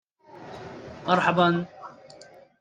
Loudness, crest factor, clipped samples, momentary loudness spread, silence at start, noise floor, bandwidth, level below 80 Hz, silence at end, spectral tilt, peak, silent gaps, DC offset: -23 LUFS; 22 dB; under 0.1%; 24 LU; 0.35 s; -50 dBFS; 9.2 kHz; -64 dBFS; 0.7 s; -6.5 dB/octave; -6 dBFS; none; under 0.1%